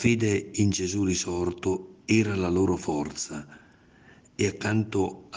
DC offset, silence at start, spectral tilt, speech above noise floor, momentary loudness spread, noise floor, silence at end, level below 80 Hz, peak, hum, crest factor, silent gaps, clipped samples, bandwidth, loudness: under 0.1%; 0 s; -5 dB/octave; 29 dB; 9 LU; -55 dBFS; 0 s; -58 dBFS; -8 dBFS; none; 18 dB; none; under 0.1%; 10 kHz; -27 LUFS